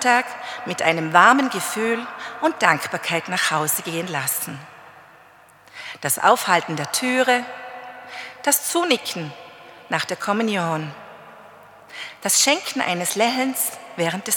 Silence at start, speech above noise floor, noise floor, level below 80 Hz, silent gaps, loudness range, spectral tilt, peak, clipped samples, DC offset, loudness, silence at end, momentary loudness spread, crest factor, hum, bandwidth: 0 s; 29 dB; -50 dBFS; -76 dBFS; none; 5 LU; -2.5 dB/octave; 0 dBFS; under 0.1%; under 0.1%; -20 LUFS; 0 s; 18 LU; 22 dB; none; 19 kHz